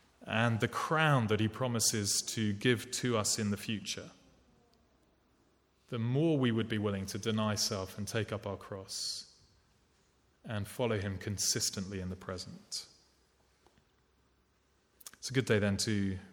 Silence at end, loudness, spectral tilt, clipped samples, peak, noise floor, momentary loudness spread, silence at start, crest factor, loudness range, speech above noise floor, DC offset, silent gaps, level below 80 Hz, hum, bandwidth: 0 s; -33 LUFS; -4 dB/octave; under 0.1%; -14 dBFS; -72 dBFS; 12 LU; 0.2 s; 22 dB; 9 LU; 39 dB; under 0.1%; none; -68 dBFS; none; 18.5 kHz